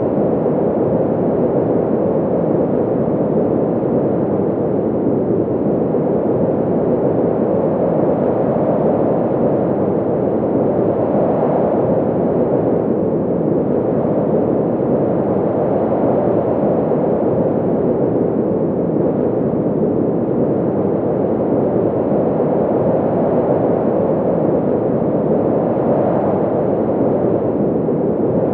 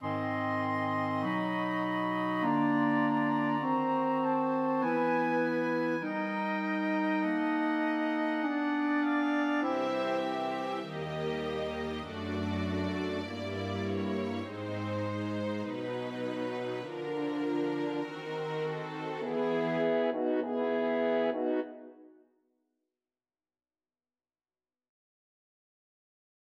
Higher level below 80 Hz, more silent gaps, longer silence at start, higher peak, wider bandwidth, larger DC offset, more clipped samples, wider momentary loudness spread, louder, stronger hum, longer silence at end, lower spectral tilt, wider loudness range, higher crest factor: first, -46 dBFS vs -68 dBFS; neither; about the same, 0 s vs 0 s; first, -2 dBFS vs -18 dBFS; second, 3.9 kHz vs 9 kHz; neither; neither; second, 2 LU vs 7 LU; first, -16 LUFS vs -32 LUFS; neither; second, 0 s vs 4.5 s; first, -13.5 dB/octave vs -7 dB/octave; second, 1 LU vs 6 LU; about the same, 12 dB vs 14 dB